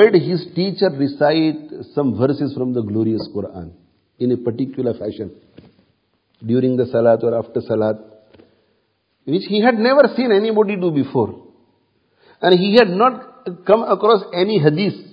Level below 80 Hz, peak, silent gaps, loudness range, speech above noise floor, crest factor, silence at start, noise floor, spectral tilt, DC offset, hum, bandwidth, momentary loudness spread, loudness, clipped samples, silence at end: -56 dBFS; 0 dBFS; none; 7 LU; 49 dB; 18 dB; 0 s; -65 dBFS; -9 dB/octave; under 0.1%; none; 5.4 kHz; 14 LU; -17 LUFS; under 0.1%; 0.1 s